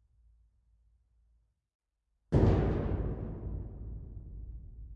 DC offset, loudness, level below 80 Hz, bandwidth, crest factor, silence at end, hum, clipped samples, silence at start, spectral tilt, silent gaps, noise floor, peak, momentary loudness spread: under 0.1%; -32 LUFS; -42 dBFS; 7 kHz; 24 dB; 0 s; none; under 0.1%; 2.3 s; -10 dB/octave; none; -81 dBFS; -12 dBFS; 21 LU